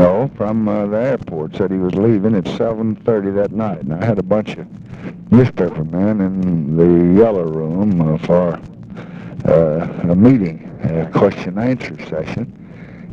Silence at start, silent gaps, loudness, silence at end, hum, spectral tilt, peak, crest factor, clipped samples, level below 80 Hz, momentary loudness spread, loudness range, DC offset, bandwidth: 0 s; none; -16 LUFS; 0 s; none; -9.5 dB/octave; 0 dBFS; 14 dB; under 0.1%; -44 dBFS; 18 LU; 3 LU; under 0.1%; 7.2 kHz